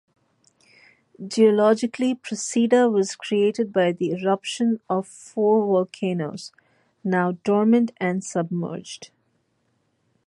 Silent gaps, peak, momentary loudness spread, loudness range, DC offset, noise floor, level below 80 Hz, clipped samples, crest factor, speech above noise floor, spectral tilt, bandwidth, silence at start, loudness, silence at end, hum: none; -6 dBFS; 14 LU; 4 LU; under 0.1%; -69 dBFS; -72 dBFS; under 0.1%; 16 dB; 48 dB; -5.5 dB/octave; 11.5 kHz; 1.2 s; -22 LUFS; 1.2 s; none